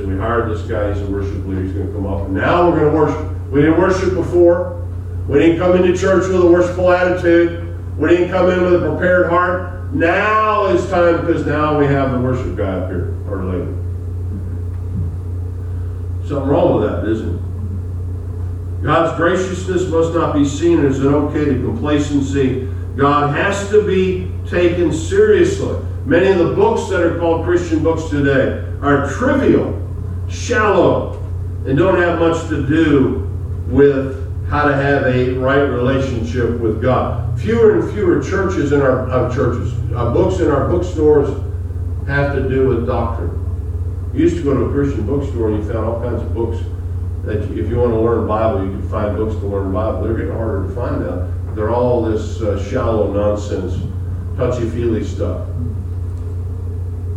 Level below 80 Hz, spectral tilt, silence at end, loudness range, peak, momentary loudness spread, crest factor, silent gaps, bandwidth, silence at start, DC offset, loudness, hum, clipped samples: -30 dBFS; -7.5 dB/octave; 0 s; 6 LU; 0 dBFS; 11 LU; 16 dB; none; 9 kHz; 0 s; under 0.1%; -16 LUFS; none; under 0.1%